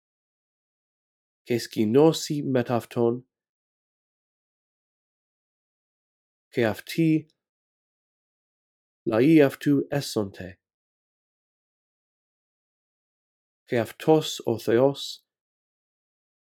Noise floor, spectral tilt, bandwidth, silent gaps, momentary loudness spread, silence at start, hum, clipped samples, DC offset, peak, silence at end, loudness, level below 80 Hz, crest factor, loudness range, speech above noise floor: under -90 dBFS; -6 dB/octave; 17 kHz; 3.49-6.51 s, 7.49-9.06 s, 10.74-13.66 s; 15 LU; 1.5 s; none; under 0.1%; under 0.1%; -6 dBFS; 1.3 s; -24 LUFS; -72 dBFS; 22 dB; 10 LU; over 67 dB